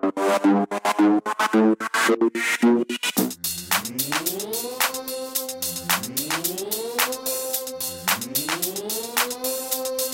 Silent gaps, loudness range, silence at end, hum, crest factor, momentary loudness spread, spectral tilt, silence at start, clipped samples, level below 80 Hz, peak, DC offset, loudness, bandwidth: none; 4 LU; 0 s; none; 20 dB; 7 LU; -2.5 dB/octave; 0 s; under 0.1%; -64 dBFS; -4 dBFS; under 0.1%; -23 LUFS; 17 kHz